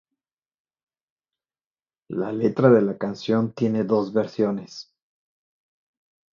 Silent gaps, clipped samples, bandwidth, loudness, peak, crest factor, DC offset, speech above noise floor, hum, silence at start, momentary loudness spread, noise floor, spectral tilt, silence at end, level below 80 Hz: none; under 0.1%; 7.2 kHz; -22 LUFS; -4 dBFS; 22 dB; under 0.1%; over 68 dB; none; 2.1 s; 15 LU; under -90 dBFS; -8 dB/octave; 1.5 s; -68 dBFS